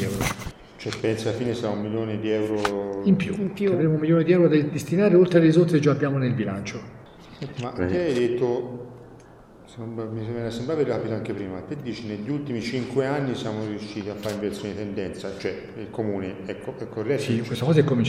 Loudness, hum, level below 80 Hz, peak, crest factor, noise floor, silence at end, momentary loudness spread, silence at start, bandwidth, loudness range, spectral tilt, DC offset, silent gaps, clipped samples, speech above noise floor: -24 LUFS; none; -52 dBFS; -4 dBFS; 20 dB; -48 dBFS; 0 s; 15 LU; 0 s; 16.5 kHz; 10 LU; -7 dB/octave; under 0.1%; none; under 0.1%; 24 dB